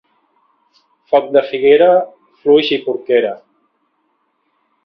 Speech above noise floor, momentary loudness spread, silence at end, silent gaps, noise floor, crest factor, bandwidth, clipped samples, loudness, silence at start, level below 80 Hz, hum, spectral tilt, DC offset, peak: 52 dB; 12 LU; 1.5 s; none; -64 dBFS; 16 dB; 5.8 kHz; under 0.1%; -13 LUFS; 1.1 s; -62 dBFS; none; -6.5 dB/octave; under 0.1%; 0 dBFS